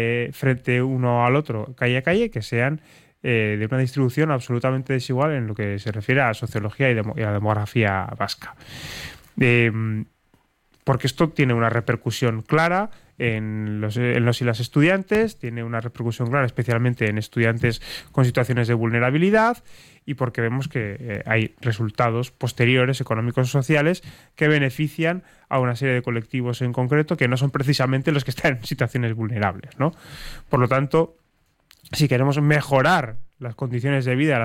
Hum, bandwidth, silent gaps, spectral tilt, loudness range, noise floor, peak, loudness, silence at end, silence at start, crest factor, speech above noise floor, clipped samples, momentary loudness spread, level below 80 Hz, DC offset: none; 15.5 kHz; none; -6.5 dB/octave; 2 LU; -65 dBFS; -6 dBFS; -22 LUFS; 0 s; 0 s; 16 dB; 44 dB; under 0.1%; 10 LU; -52 dBFS; under 0.1%